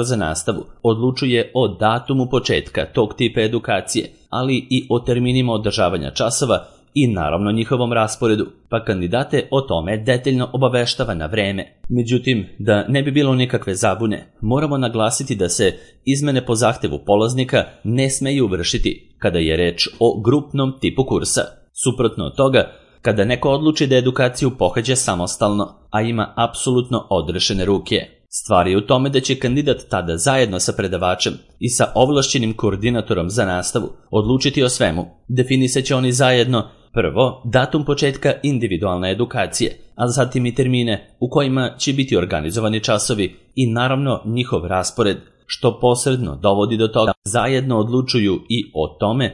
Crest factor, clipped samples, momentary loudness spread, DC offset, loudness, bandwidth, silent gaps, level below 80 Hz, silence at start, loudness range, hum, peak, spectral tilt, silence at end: 18 dB; under 0.1%; 6 LU; under 0.1%; -18 LUFS; 12 kHz; 47.17-47.22 s; -40 dBFS; 0 s; 2 LU; none; 0 dBFS; -5 dB/octave; 0 s